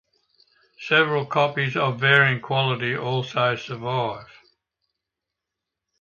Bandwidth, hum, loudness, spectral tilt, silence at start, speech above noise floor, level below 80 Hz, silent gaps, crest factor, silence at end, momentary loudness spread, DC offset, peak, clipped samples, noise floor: 7 kHz; none; -21 LUFS; -6 dB/octave; 0.8 s; 63 dB; -66 dBFS; none; 22 dB; 1.75 s; 11 LU; under 0.1%; -2 dBFS; under 0.1%; -85 dBFS